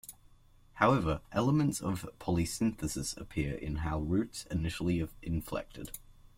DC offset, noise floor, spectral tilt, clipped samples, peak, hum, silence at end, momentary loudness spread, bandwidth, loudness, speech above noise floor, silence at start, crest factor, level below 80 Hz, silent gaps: under 0.1%; -60 dBFS; -6 dB/octave; under 0.1%; -12 dBFS; none; 0.25 s; 11 LU; 16.5 kHz; -33 LUFS; 28 dB; 0.05 s; 22 dB; -48 dBFS; none